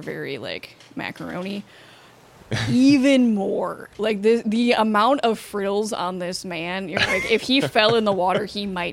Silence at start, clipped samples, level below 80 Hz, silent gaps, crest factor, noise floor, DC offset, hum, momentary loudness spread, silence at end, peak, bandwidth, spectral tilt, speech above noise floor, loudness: 0 s; under 0.1%; -54 dBFS; none; 20 dB; -49 dBFS; under 0.1%; none; 14 LU; 0 s; -2 dBFS; 15.5 kHz; -5 dB/octave; 27 dB; -21 LUFS